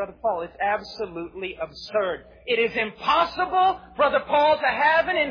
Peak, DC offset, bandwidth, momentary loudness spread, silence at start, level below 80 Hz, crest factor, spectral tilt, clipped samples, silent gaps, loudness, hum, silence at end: -8 dBFS; under 0.1%; 5.2 kHz; 13 LU; 0 s; -54 dBFS; 16 dB; -4.5 dB/octave; under 0.1%; none; -23 LUFS; none; 0 s